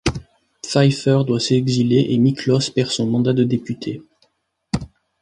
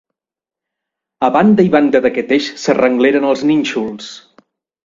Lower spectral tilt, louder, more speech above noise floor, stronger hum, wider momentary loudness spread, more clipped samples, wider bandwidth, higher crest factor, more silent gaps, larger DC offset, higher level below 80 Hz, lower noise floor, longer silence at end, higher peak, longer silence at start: about the same, -6 dB/octave vs -6 dB/octave; second, -18 LUFS vs -13 LUFS; second, 50 dB vs 75 dB; neither; about the same, 12 LU vs 11 LU; neither; first, 11 kHz vs 7.6 kHz; about the same, 16 dB vs 14 dB; neither; neither; first, -44 dBFS vs -54 dBFS; second, -67 dBFS vs -88 dBFS; second, 0.35 s vs 0.65 s; about the same, -2 dBFS vs 0 dBFS; second, 0.05 s vs 1.2 s